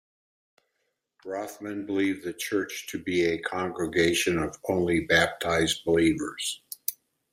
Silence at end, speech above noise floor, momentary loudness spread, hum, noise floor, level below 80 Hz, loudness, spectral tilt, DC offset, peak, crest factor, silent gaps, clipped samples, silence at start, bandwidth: 0.4 s; 52 dB; 12 LU; none; -78 dBFS; -56 dBFS; -27 LUFS; -4 dB/octave; under 0.1%; -8 dBFS; 20 dB; none; under 0.1%; 1.25 s; 16 kHz